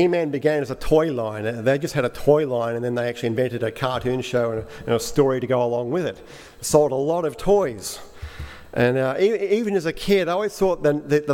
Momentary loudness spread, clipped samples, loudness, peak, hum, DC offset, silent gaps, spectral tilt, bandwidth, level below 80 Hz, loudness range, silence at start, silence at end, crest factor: 11 LU; under 0.1%; -22 LUFS; -2 dBFS; none; under 0.1%; none; -5.5 dB/octave; 17 kHz; -42 dBFS; 2 LU; 0 s; 0 s; 18 dB